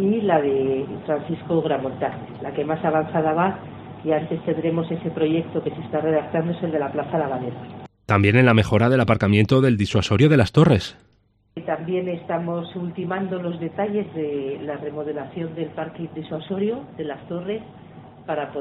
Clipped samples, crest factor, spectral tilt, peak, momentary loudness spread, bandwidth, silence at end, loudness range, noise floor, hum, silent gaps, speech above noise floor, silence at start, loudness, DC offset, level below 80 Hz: under 0.1%; 20 dB; -7.5 dB/octave; -2 dBFS; 14 LU; 10.5 kHz; 0 s; 11 LU; -61 dBFS; none; none; 39 dB; 0 s; -22 LUFS; under 0.1%; -52 dBFS